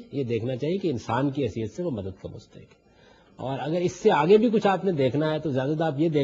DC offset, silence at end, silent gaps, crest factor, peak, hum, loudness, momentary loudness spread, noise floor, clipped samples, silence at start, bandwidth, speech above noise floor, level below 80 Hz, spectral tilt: under 0.1%; 0 s; none; 18 dB; -8 dBFS; none; -25 LUFS; 15 LU; -56 dBFS; under 0.1%; 0 s; 7.6 kHz; 31 dB; -60 dBFS; -7 dB/octave